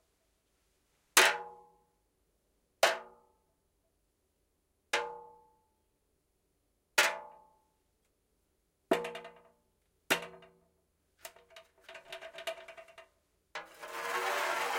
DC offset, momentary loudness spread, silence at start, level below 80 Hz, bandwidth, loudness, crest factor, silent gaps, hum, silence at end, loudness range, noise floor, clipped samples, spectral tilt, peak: under 0.1%; 24 LU; 1.15 s; -78 dBFS; 16.5 kHz; -32 LUFS; 30 dB; none; none; 0 s; 12 LU; -78 dBFS; under 0.1%; 0 dB/octave; -8 dBFS